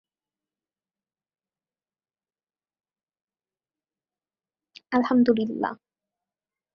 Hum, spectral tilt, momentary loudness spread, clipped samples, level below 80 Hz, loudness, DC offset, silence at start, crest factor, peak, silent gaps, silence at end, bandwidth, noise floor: none; -7.5 dB/octave; 10 LU; under 0.1%; -72 dBFS; -24 LUFS; under 0.1%; 4.9 s; 22 dB; -8 dBFS; none; 1 s; 6 kHz; under -90 dBFS